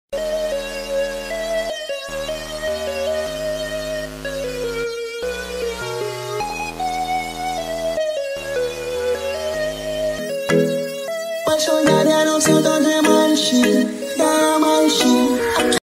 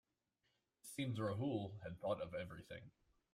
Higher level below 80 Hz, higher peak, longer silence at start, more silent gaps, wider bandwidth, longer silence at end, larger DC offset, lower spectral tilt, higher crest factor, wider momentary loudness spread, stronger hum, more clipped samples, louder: first, -44 dBFS vs -74 dBFS; first, -2 dBFS vs -28 dBFS; second, 0.1 s vs 0.85 s; neither; about the same, 16 kHz vs 16 kHz; second, 0.1 s vs 0.45 s; neither; second, -3.5 dB/octave vs -6.5 dB/octave; about the same, 18 dB vs 18 dB; second, 11 LU vs 14 LU; neither; neither; first, -20 LUFS vs -45 LUFS